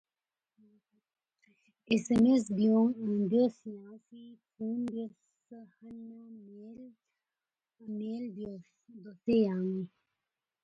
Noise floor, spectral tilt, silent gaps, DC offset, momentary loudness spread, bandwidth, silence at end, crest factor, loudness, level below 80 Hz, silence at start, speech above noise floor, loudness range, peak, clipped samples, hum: under -90 dBFS; -7 dB/octave; none; under 0.1%; 25 LU; 9 kHz; 0.75 s; 18 dB; -31 LUFS; -70 dBFS; 1.9 s; over 58 dB; 15 LU; -14 dBFS; under 0.1%; none